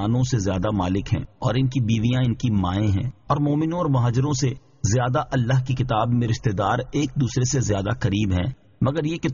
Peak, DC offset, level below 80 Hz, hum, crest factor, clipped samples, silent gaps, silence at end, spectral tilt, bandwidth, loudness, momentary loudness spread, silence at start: -6 dBFS; 0.1%; -42 dBFS; none; 16 dB; under 0.1%; none; 0 s; -7 dB/octave; 7.4 kHz; -23 LUFS; 4 LU; 0 s